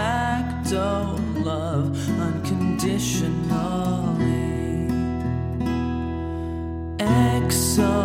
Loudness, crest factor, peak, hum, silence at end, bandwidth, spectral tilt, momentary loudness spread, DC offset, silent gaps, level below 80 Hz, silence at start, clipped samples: -24 LUFS; 16 dB; -8 dBFS; none; 0 s; 16.5 kHz; -5.5 dB/octave; 7 LU; under 0.1%; none; -36 dBFS; 0 s; under 0.1%